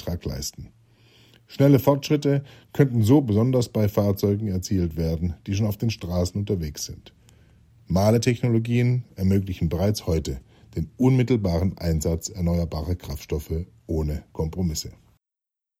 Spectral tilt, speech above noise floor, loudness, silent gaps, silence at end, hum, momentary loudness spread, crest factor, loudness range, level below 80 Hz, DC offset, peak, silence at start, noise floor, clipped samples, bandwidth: -7 dB/octave; 61 dB; -24 LUFS; none; 0.9 s; none; 13 LU; 20 dB; 6 LU; -42 dBFS; under 0.1%; -4 dBFS; 0 s; -84 dBFS; under 0.1%; 16.5 kHz